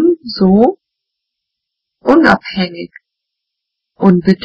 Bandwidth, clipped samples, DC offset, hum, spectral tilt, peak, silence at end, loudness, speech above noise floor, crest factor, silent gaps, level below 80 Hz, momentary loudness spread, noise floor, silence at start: 8 kHz; 0.4%; under 0.1%; none; -8 dB/octave; 0 dBFS; 0 s; -12 LUFS; 67 dB; 14 dB; none; -46 dBFS; 11 LU; -77 dBFS; 0 s